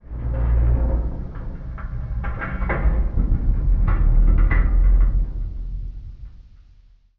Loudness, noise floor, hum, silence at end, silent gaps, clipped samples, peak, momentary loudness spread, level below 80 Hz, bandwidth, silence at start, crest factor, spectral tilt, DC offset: -23 LUFS; -51 dBFS; none; 0.75 s; none; under 0.1%; -6 dBFS; 14 LU; -20 dBFS; 2.9 kHz; 0.1 s; 12 dB; -9 dB/octave; under 0.1%